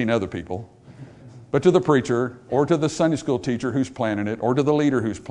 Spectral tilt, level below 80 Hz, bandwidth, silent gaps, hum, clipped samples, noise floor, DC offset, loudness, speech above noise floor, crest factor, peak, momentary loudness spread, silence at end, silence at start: -6.5 dB/octave; -56 dBFS; 10.5 kHz; none; none; under 0.1%; -43 dBFS; under 0.1%; -22 LUFS; 22 dB; 18 dB; -4 dBFS; 7 LU; 0 s; 0 s